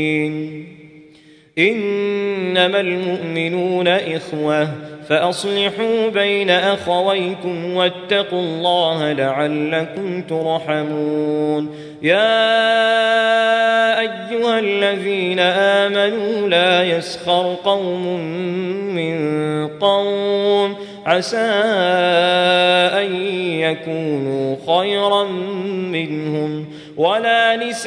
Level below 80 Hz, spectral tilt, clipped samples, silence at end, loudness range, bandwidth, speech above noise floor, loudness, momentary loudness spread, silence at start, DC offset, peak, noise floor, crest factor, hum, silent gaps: -66 dBFS; -5 dB/octave; under 0.1%; 0 s; 4 LU; 10.5 kHz; 30 dB; -17 LUFS; 9 LU; 0 s; under 0.1%; -2 dBFS; -47 dBFS; 16 dB; none; none